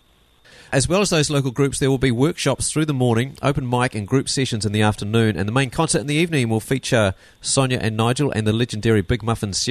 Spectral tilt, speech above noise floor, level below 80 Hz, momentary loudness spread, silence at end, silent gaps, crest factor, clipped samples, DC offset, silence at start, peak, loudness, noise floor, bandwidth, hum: -5 dB/octave; 35 dB; -42 dBFS; 3 LU; 0 s; none; 16 dB; under 0.1%; under 0.1%; 0.7 s; -4 dBFS; -20 LUFS; -54 dBFS; 13.5 kHz; none